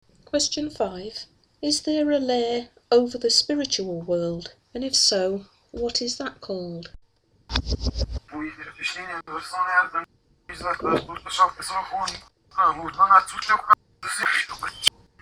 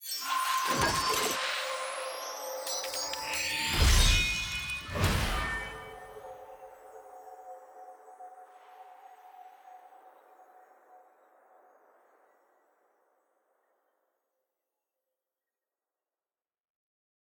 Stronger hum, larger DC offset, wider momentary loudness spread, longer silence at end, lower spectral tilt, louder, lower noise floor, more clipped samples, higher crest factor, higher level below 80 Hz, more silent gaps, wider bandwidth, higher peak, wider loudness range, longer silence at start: neither; neither; second, 15 LU vs 25 LU; second, 0.35 s vs 6.4 s; about the same, -2.5 dB/octave vs -2.5 dB/octave; first, -24 LUFS vs -30 LUFS; second, -61 dBFS vs under -90 dBFS; neither; about the same, 24 dB vs 24 dB; about the same, -42 dBFS vs -40 dBFS; neither; about the same, over 20 kHz vs over 20 kHz; first, 0 dBFS vs -10 dBFS; second, 8 LU vs 23 LU; first, 0.35 s vs 0 s